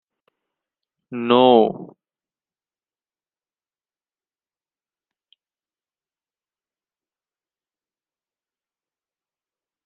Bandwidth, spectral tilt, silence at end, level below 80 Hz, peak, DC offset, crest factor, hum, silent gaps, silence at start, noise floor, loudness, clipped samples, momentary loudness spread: 4.3 kHz; -3.5 dB/octave; 8 s; -74 dBFS; -2 dBFS; under 0.1%; 24 dB; none; none; 1.1 s; under -90 dBFS; -16 LUFS; under 0.1%; 21 LU